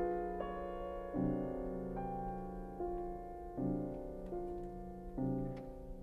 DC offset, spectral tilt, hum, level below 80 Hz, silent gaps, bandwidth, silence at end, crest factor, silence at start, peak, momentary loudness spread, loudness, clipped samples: under 0.1%; -10 dB/octave; none; -52 dBFS; none; 13.5 kHz; 0 s; 16 dB; 0 s; -26 dBFS; 8 LU; -42 LUFS; under 0.1%